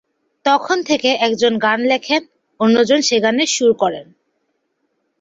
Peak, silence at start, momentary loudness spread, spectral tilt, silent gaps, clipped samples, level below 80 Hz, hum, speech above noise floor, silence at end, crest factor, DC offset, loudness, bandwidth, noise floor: -2 dBFS; 0.45 s; 6 LU; -3 dB/octave; none; under 0.1%; -62 dBFS; none; 53 dB; 1.15 s; 14 dB; under 0.1%; -16 LUFS; 8 kHz; -69 dBFS